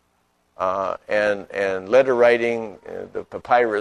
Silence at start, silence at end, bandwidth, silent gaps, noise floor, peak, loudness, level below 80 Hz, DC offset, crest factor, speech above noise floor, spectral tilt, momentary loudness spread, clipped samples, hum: 0.6 s; 0 s; 10.5 kHz; none; -66 dBFS; -2 dBFS; -20 LUFS; -60 dBFS; under 0.1%; 18 dB; 46 dB; -5 dB/octave; 16 LU; under 0.1%; none